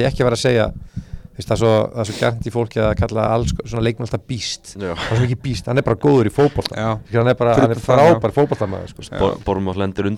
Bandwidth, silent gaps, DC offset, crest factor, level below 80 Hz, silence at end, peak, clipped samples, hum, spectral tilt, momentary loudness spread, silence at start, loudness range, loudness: 13.5 kHz; none; under 0.1%; 18 dB; -36 dBFS; 0 s; 0 dBFS; under 0.1%; none; -6.5 dB/octave; 11 LU; 0 s; 5 LU; -18 LUFS